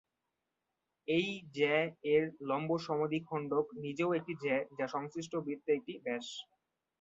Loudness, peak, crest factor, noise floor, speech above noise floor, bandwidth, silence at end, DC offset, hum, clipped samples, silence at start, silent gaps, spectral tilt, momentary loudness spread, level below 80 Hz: -35 LUFS; -18 dBFS; 18 dB; -87 dBFS; 52 dB; 7.8 kHz; 0.6 s; under 0.1%; none; under 0.1%; 1.1 s; none; -4 dB/octave; 8 LU; -78 dBFS